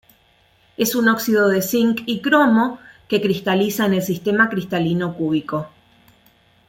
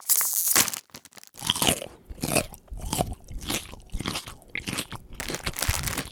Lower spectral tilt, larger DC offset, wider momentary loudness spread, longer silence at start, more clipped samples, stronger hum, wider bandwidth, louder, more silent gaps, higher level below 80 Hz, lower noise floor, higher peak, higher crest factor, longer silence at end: first, -5 dB/octave vs -2 dB/octave; neither; second, 8 LU vs 19 LU; first, 0.8 s vs 0 s; neither; neither; second, 17 kHz vs over 20 kHz; first, -19 LUFS vs -26 LUFS; neither; second, -60 dBFS vs -42 dBFS; first, -57 dBFS vs -48 dBFS; about the same, -2 dBFS vs -2 dBFS; second, 18 dB vs 26 dB; first, 1 s vs 0 s